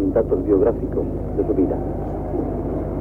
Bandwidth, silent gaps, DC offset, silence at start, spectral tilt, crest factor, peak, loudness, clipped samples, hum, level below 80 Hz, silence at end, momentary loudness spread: 3.1 kHz; none; under 0.1%; 0 s; -11.5 dB/octave; 14 dB; -6 dBFS; -22 LUFS; under 0.1%; 50 Hz at -30 dBFS; -32 dBFS; 0 s; 7 LU